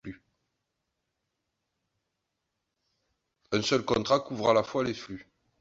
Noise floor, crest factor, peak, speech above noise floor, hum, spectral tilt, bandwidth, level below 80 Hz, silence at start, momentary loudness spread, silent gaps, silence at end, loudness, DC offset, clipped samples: -83 dBFS; 24 dB; -10 dBFS; 55 dB; none; -4.5 dB/octave; 8 kHz; -62 dBFS; 0.05 s; 18 LU; none; 0.4 s; -28 LUFS; under 0.1%; under 0.1%